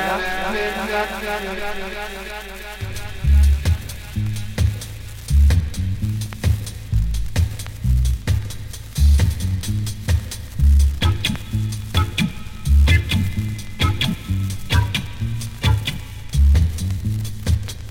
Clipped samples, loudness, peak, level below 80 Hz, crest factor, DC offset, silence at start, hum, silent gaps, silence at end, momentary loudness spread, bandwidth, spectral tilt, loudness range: under 0.1%; -21 LUFS; -2 dBFS; -22 dBFS; 16 dB; under 0.1%; 0 s; none; none; 0 s; 13 LU; 16.5 kHz; -5.5 dB/octave; 3 LU